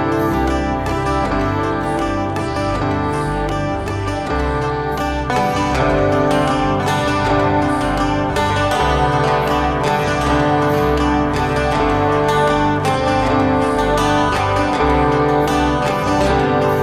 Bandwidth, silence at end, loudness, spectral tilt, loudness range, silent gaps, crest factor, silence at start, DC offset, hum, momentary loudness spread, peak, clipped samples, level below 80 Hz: 15 kHz; 0 s; -17 LUFS; -6 dB/octave; 4 LU; none; 14 dB; 0 s; under 0.1%; none; 5 LU; -2 dBFS; under 0.1%; -28 dBFS